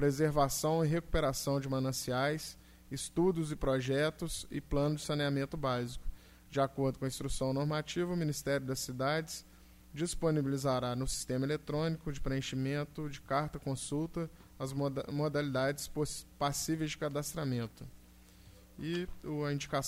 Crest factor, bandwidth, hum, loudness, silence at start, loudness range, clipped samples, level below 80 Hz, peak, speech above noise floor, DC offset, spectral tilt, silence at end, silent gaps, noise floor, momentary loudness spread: 18 dB; 16 kHz; none; -35 LUFS; 0 s; 3 LU; under 0.1%; -50 dBFS; -18 dBFS; 23 dB; under 0.1%; -5 dB/octave; 0 s; none; -58 dBFS; 9 LU